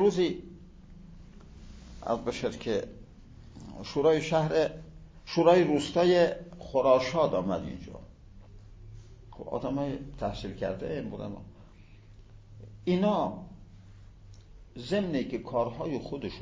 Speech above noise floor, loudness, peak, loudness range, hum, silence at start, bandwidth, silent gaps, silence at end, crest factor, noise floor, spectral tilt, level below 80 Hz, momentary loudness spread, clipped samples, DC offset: 24 dB; -29 LUFS; -8 dBFS; 11 LU; none; 0 s; 8 kHz; none; 0 s; 22 dB; -52 dBFS; -6.5 dB/octave; -52 dBFS; 25 LU; under 0.1%; under 0.1%